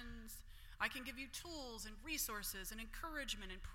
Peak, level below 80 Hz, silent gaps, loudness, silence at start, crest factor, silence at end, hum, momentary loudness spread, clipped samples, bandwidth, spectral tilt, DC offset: -24 dBFS; -56 dBFS; none; -46 LUFS; 0 s; 24 dB; 0 s; none; 12 LU; under 0.1%; 16.5 kHz; -1.5 dB/octave; under 0.1%